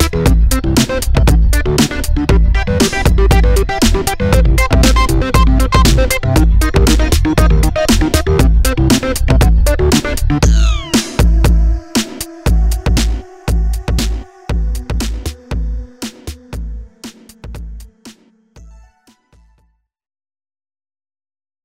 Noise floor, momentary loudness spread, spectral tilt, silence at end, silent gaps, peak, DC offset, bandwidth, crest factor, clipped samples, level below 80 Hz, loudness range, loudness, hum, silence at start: -58 dBFS; 15 LU; -5 dB/octave; 3 s; none; 0 dBFS; under 0.1%; 16 kHz; 12 dB; under 0.1%; -14 dBFS; 14 LU; -13 LUFS; none; 0 s